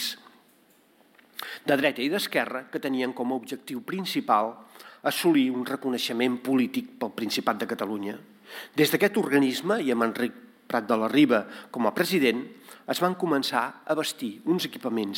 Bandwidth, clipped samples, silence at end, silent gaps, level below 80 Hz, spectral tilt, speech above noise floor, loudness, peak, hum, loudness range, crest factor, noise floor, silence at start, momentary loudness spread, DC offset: 17 kHz; under 0.1%; 0 s; none; -76 dBFS; -4.5 dB/octave; 35 dB; -26 LUFS; -8 dBFS; none; 4 LU; 20 dB; -61 dBFS; 0 s; 12 LU; under 0.1%